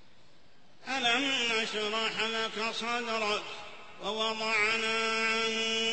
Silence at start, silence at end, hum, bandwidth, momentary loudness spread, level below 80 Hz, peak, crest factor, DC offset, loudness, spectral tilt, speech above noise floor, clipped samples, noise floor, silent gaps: 0.8 s; 0 s; none; 8.4 kHz; 10 LU; -72 dBFS; -16 dBFS; 16 dB; 0.3%; -29 LUFS; -1.5 dB/octave; 31 dB; under 0.1%; -62 dBFS; none